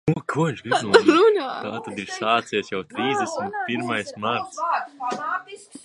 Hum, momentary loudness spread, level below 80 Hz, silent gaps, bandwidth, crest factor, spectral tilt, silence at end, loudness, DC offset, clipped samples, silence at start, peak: none; 14 LU; -62 dBFS; none; 11.5 kHz; 22 dB; -5 dB/octave; 0.05 s; -23 LUFS; under 0.1%; under 0.1%; 0.05 s; 0 dBFS